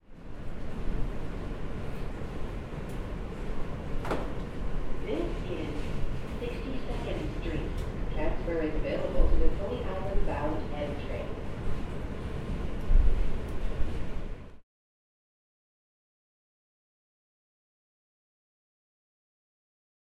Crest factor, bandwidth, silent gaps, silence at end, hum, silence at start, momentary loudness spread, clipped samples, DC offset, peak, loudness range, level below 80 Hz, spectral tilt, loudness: 20 dB; 6.4 kHz; none; 5.45 s; none; 0.1 s; 8 LU; under 0.1%; under 0.1%; -10 dBFS; 6 LU; -34 dBFS; -7.5 dB/octave; -35 LUFS